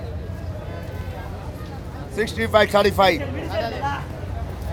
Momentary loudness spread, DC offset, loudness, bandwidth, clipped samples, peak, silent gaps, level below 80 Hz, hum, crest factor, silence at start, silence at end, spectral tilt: 16 LU; under 0.1%; -23 LUFS; 18 kHz; under 0.1%; -2 dBFS; none; -36 dBFS; none; 22 dB; 0 s; 0 s; -5.5 dB/octave